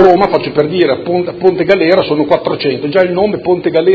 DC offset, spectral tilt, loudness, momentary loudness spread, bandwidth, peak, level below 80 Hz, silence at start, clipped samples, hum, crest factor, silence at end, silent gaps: under 0.1%; -8 dB/octave; -12 LUFS; 5 LU; 6 kHz; 0 dBFS; -46 dBFS; 0 s; 0.3%; none; 10 dB; 0 s; none